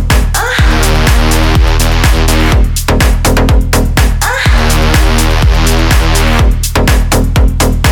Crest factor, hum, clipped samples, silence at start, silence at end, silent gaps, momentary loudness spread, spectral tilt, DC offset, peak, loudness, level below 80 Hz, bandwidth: 8 dB; none; under 0.1%; 0 s; 0 s; none; 2 LU; -4.5 dB/octave; under 0.1%; 0 dBFS; -10 LUFS; -10 dBFS; 18.5 kHz